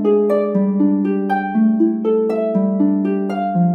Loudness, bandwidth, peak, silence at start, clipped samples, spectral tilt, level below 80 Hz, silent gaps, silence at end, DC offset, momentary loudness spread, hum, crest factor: -17 LUFS; 4.3 kHz; -6 dBFS; 0 s; under 0.1%; -10.5 dB/octave; -72 dBFS; none; 0 s; under 0.1%; 4 LU; none; 10 dB